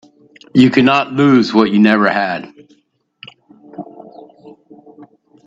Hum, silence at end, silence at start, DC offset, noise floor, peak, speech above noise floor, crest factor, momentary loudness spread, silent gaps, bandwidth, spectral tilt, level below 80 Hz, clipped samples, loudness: none; 0.45 s; 0.55 s; under 0.1%; -59 dBFS; 0 dBFS; 47 dB; 16 dB; 23 LU; none; 7.6 kHz; -7 dB/octave; -56 dBFS; under 0.1%; -12 LUFS